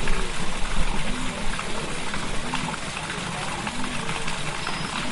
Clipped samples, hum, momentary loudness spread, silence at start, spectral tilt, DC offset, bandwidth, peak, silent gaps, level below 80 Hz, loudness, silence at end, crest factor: under 0.1%; none; 1 LU; 0 s; -3.5 dB/octave; under 0.1%; 11.5 kHz; -8 dBFS; none; -30 dBFS; -29 LUFS; 0 s; 16 dB